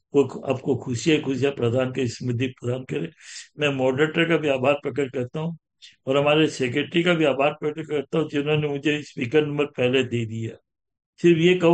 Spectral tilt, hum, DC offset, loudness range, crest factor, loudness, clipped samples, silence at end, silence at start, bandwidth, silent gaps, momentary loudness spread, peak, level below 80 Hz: -6 dB/octave; none; under 0.1%; 2 LU; 18 dB; -23 LUFS; under 0.1%; 0 s; 0.15 s; 9.2 kHz; 11.06-11.13 s; 11 LU; -6 dBFS; -64 dBFS